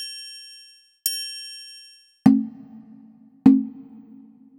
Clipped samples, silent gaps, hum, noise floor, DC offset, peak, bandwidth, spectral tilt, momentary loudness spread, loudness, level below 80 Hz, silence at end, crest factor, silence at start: under 0.1%; none; none; -51 dBFS; under 0.1%; 0 dBFS; 18.5 kHz; -4.5 dB/octave; 26 LU; -21 LUFS; -62 dBFS; 0.8 s; 24 dB; 0 s